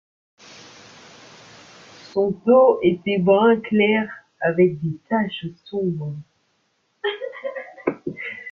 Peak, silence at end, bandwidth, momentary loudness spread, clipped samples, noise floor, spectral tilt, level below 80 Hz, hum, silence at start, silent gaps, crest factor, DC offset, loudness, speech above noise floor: -4 dBFS; 0 s; 7.2 kHz; 16 LU; under 0.1%; -68 dBFS; -7.5 dB/octave; -64 dBFS; none; 2.15 s; none; 18 dB; under 0.1%; -21 LUFS; 49 dB